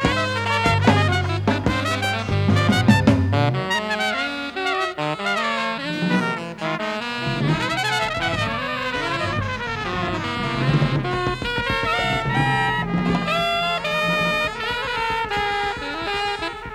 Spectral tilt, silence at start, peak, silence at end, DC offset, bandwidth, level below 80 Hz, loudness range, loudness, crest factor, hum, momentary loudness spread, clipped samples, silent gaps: -5.5 dB/octave; 0 s; -2 dBFS; 0 s; under 0.1%; 14 kHz; -42 dBFS; 4 LU; -21 LUFS; 20 dB; none; 7 LU; under 0.1%; none